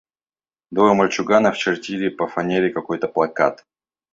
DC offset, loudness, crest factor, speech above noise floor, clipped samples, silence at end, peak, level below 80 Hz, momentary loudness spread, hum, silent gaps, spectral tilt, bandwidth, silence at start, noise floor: under 0.1%; -19 LUFS; 18 dB; over 71 dB; under 0.1%; 0.6 s; -2 dBFS; -60 dBFS; 8 LU; none; none; -5.5 dB/octave; 7.8 kHz; 0.7 s; under -90 dBFS